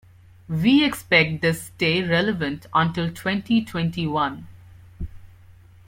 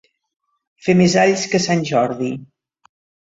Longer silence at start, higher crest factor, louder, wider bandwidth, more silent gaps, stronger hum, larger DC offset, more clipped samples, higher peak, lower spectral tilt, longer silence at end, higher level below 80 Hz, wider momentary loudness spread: second, 0.5 s vs 0.85 s; about the same, 20 dB vs 16 dB; second, -21 LUFS vs -17 LUFS; first, 16.5 kHz vs 8 kHz; neither; neither; neither; neither; about the same, -4 dBFS vs -2 dBFS; about the same, -5.5 dB/octave vs -5 dB/octave; second, 0.35 s vs 0.9 s; first, -48 dBFS vs -56 dBFS; first, 16 LU vs 12 LU